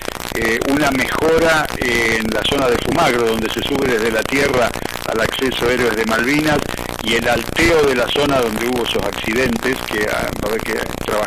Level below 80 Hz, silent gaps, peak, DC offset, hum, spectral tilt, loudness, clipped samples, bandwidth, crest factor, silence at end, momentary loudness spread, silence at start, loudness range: -34 dBFS; none; -4 dBFS; under 0.1%; none; -4 dB/octave; -17 LUFS; under 0.1%; 16 kHz; 12 dB; 0 s; 6 LU; 0 s; 1 LU